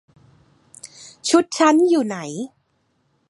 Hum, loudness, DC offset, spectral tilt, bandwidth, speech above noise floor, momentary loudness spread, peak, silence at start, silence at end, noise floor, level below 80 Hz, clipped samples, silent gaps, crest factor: none; -18 LUFS; under 0.1%; -3.5 dB/octave; 11.5 kHz; 49 dB; 24 LU; -2 dBFS; 0.85 s; 0.85 s; -67 dBFS; -70 dBFS; under 0.1%; none; 20 dB